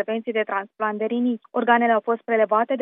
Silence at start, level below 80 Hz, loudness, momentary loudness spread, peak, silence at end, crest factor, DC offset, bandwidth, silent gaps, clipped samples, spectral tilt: 0 s; -88 dBFS; -22 LUFS; 7 LU; -4 dBFS; 0 s; 18 dB; under 0.1%; 3.8 kHz; none; under 0.1%; -9.5 dB/octave